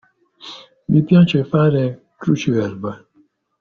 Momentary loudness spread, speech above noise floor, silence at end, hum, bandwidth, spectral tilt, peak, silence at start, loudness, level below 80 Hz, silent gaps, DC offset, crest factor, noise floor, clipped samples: 22 LU; 43 dB; 0.65 s; none; 6.8 kHz; -7.5 dB/octave; -2 dBFS; 0.45 s; -17 LUFS; -54 dBFS; none; under 0.1%; 16 dB; -58 dBFS; under 0.1%